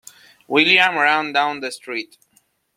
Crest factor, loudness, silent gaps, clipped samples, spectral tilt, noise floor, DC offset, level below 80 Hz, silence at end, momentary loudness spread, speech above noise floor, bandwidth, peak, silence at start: 20 dB; -17 LUFS; none; under 0.1%; -3 dB/octave; -62 dBFS; under 0.1%; -68 dBFS; 0.7 s; 15 LU; 43 dB; 16 kHz; -2 dBFS; 0.5 s